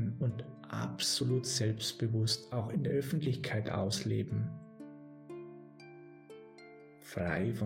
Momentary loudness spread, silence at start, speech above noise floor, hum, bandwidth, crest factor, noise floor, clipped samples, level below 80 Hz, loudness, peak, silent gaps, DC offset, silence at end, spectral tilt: 21 LU; 0 s; 21 dB; none; 16 kHz; 16 dB; -55 dBFS; under 0.1%; -66 dBFS; -35 LUFS; -20 dBFS; none; under 0.1%; 0 s; -5 dB/octave